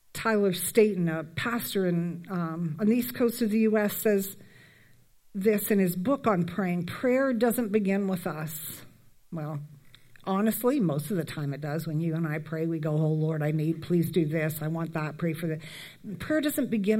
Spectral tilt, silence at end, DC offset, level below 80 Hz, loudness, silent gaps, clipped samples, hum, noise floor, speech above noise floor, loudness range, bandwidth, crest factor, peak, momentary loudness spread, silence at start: -6.5 dB/octave; 0 s; under 0.1%; -66 dBFS; -28 LUFS; none; under 0.1%; none; -57 dBFS; 30 dB; 4 LU; 16.5 kHz; 20 dB; -8 dBFS; 12 LU; 0.15 s